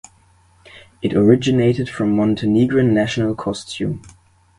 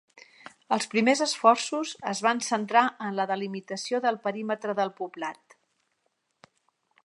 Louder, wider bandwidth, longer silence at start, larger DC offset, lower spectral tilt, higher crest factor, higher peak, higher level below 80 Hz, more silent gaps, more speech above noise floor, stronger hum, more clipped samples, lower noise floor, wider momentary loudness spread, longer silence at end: first, -18 LUFS vs -27 LUFS; about the same, 11.5 kHz vs 11.5 kHz; first, 0.75 s vs 0.15 s; neither; first, -7 dB/octave vs -3.5 dB/octave; about the same, 18 dB vs 22 dB; first, 0 dBFS vs -6 dBFS; first, -46 dBFS vs -82 dBFS; neither; second, 37 dB vs 50 dB; neither; neither; second, -53 dBFS vs -76 dBFS; about the same, 11 LU vs 12 LU; second, 0.5 s vs 1.7 s